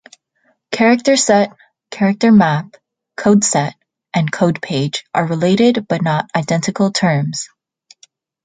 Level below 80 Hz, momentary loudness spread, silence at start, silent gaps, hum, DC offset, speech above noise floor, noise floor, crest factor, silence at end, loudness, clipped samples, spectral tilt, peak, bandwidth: -58 dBFS; 11 LU; 0.7 s; none; none; under 0.1%; 48 dB; -62 dBFS; 14 dB; 1 s; -15 LUFS; under 0.1%; -5 dB/octave; -2 dBFS; 9.6 kHz